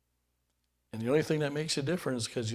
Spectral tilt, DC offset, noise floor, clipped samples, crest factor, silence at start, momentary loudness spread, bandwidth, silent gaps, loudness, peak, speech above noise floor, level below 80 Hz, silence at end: -5 dB/octave; under 0.1%; -78 dBFS; under 0.1%; 18 dB; 0.95 s; 7 LU; 16 kHz; none; -32 LUFS; -14 dBFS; 47 dB; -66 dBFS; 0 s